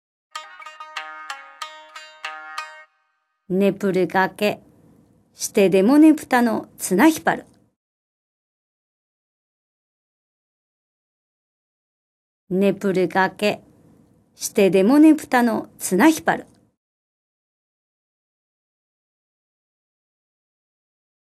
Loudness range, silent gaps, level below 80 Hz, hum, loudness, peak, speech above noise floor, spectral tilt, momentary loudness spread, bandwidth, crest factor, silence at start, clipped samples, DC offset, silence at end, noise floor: 11 LU; 7.76-12.47 s; -68 dBFS; none; -18 LUFS; -4 dBFS; 53 dB; -5 dB/octave; 22 LU; 15 kHz; 18 dB; 0.35 s; under 0.1%; under 0.1%; 4.8 s; -70 dBFS